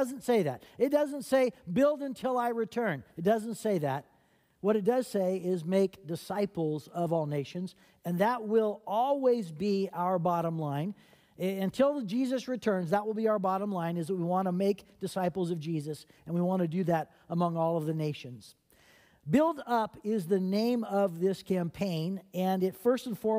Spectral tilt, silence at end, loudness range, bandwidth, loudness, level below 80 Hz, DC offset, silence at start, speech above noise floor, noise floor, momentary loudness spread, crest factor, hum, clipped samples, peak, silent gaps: -7 dB/octave; 0 s; 2 LU; 16 kHz; -31 LUFS; -70 dBFS; under 0.1%; 0 s; 38 dB; -68 dBFS; 8 LU; 18 dB; none; under 0.1%; -14 dBFS; none